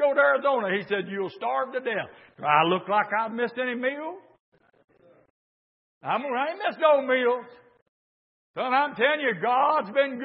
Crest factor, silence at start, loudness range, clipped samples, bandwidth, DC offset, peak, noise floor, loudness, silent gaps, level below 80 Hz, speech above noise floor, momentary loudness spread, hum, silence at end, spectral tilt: 20 dB; 0 s; 7 LU; under 0.1%; 5.6 kHz; under 0.1%; -6 dBFS; under -90 dBFS; -25 LUFS; 4.40-4.52 s, 5.30-6.01 s, 7.82-8.54 s; -82 dBFS; over 65 dB; 11 LU; none; 0 s; -9 dB/octave